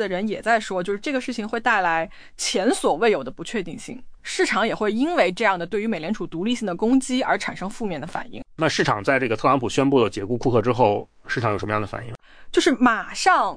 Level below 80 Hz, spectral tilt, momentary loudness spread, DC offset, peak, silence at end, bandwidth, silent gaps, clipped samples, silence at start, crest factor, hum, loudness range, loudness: -48 dBFS; -4.5 dB/octave; 10 LU; under 0.1%; -4 dBFS; 0 s; 10.5 kHz; none; under 0.1%; 0 s; 18 dB; none; 2 LU; -22 LUFS